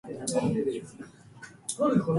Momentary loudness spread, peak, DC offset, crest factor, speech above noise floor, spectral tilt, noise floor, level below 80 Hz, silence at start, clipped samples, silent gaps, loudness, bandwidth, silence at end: 22 LU; -12 dBFS; under 0.1%; 18 dB; 23 dB; -6 dB/octave; -50 dBFS; -64 dBFS; 0.05 s; under 0.1%; none; -30 LUFS; 11.5 kHz; 0 s